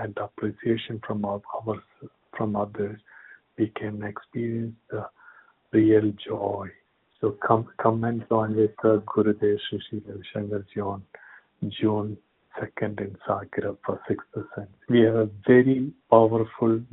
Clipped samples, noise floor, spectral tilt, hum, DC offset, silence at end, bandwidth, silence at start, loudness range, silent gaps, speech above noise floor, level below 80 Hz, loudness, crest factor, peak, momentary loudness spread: under 0.1%; -54 dBFS; -6.5 dB/octave; none; under 0.1%; 0.05 s; 4 kHz; 0 s; 9 LU; none; 29 dB; -64 dBFS; -26 LUFS; 24 dB; -2 dBFS; 16 LU